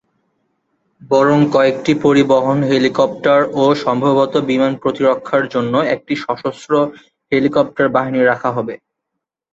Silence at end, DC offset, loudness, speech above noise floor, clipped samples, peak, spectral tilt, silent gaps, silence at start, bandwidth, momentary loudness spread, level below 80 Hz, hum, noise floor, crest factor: 0.75 s; under 0.1%; -15 LUFS; 65 dB; under 0.1%; -2 dBFS; -6.5 dB/octave; none; 1.05 s; 7.8 kHz; 8 LU; -56 dBFS; none; -79 dBFS; 14 dB